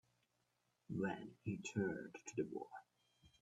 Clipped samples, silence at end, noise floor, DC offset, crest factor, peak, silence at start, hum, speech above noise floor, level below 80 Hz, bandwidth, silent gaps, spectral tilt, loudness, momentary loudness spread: under 0.1%; 0.15 s; -84 dBFS; under 0.1%; 20 dB; -28 dBFS; 0.9 s; none; 39 dB; -78 dBFS; 10.5 kHz; none; -6 dB/octave; -46 LUFS; 9 LU